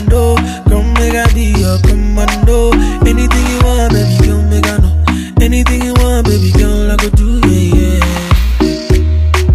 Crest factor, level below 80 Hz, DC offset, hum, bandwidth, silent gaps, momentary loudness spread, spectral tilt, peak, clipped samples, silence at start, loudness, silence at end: 8 dB; -12 dBFS; under 0.1%; none; 15 kHz; none; 3 LU; -6 dB/octave; 0 dBFS; 0.1%; 0 s; -11 LUFS; 0 s